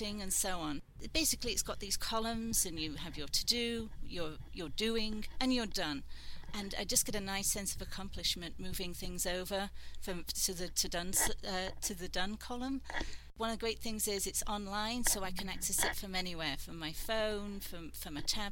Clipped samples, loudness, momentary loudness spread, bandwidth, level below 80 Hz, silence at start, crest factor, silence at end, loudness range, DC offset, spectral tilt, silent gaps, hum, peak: under 0.1%; -36 LUFS; 11 LU; 17 kHz; -46 dBFS; 0 s; 22 dB; 0 s; 3 LU; under 0.1%; -2 dB/octave; none; none; -14 dBFS